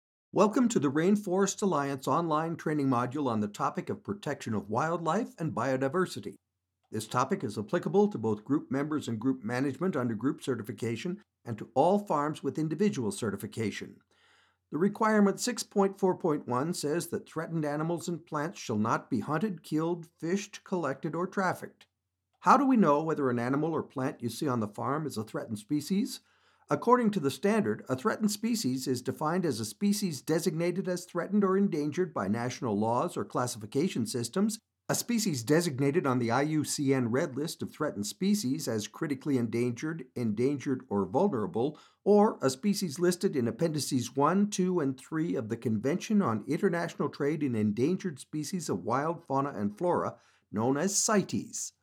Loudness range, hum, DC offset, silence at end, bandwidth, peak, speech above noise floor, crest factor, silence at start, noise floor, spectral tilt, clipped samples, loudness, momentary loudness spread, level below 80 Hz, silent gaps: 4 LU; none; under 0.1%; 0.15 s; 16.5 kHz; -10 dBFS; 51 dB; 20 dB; 0.35 s; -81 dBFS; -5.5 dB/octave; under 0.1%; -30 LUFS; 9 LU; -80 dBFS; none